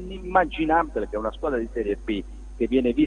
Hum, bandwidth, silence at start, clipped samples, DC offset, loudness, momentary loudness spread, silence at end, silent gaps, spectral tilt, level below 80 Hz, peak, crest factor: none; 9.6 kHz; 0 s; under 0.1%; under 0.1%; -25 LUFS; 8 LU; 0 s; none; -7 dB/octave; -38 dBFS; -4 dBFS; 20 dB